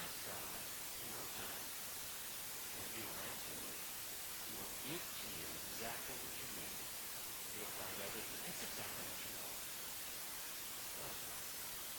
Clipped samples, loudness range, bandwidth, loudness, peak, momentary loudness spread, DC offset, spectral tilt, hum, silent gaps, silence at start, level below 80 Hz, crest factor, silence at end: under 0.1%; 0 LU; 19 kHz; -45 LUFS; -32 dBFS; 1 LU; under 0.1%; -1 dB/octave; none; none; 0 s; -70 dBFS; 16 dB; 0 s